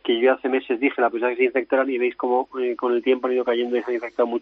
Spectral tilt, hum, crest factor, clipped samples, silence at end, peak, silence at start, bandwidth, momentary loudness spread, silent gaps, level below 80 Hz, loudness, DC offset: -1 dB/octave; none; 16 dB; under 0.1%; 0 s; -6 dBFS; 0.05 s; 4.9 kHz; 4 LU; none; -70 dBFS; -22 LUFS; under 0.1%